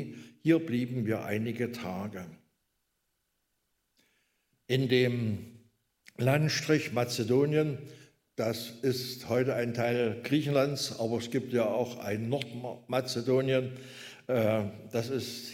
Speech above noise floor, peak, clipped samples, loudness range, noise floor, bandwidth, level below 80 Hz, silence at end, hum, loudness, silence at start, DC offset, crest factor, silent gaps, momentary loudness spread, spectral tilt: 49 dB; -12 dBFS; under 0.1%; 6 LU; -79 dBFS; 16 kHz; -72 dBFS; 0 s; none; -31 LUFS; 0 s; under 0.1%; 20 dB; none; 13 LU; -6 dB/octave